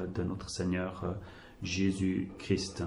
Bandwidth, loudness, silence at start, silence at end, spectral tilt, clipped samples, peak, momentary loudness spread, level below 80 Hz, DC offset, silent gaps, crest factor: 11.5 kHz; -34 LUFS; 0 s; 0 s; -5.5 dB/octave; under 0.1%; -16 dBFS; 11 LU; -54 dBFS; under 0.1%; none; 18 dB